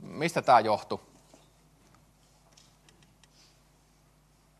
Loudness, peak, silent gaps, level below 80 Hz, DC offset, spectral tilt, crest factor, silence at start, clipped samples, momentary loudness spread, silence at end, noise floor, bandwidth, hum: -26 LUFS; -8 dBFS; none; -68 dBFS; under 0.1%; -5 dB/octave; 24 dB; 0 s; under 0.1%; 17 LU; 3.6 s; -64 dBFS; 13 kHz; none